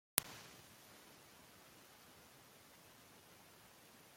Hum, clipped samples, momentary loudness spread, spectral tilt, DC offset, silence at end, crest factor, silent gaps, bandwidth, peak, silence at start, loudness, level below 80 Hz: none; under 0.1%; 10 LU; -1 dB/octave; under 0.1%; 0 s; 44 dB; none; 16.5 kHz; -8 dBFS; 0.15 s; -52 LUFS; -82 dBFS